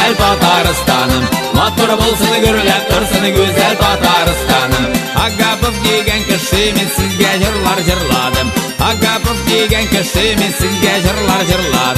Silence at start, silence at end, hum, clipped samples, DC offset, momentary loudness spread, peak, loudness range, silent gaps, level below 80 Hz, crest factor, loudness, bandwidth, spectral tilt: 0 s; 0 s; none; under 0.1%; under 0.1%; 3 LU; 0 dBFS; 1 LU; none; -24 dBFS; 12 dB; -12 LUFS; 14.5 kHz; -4 dB/octave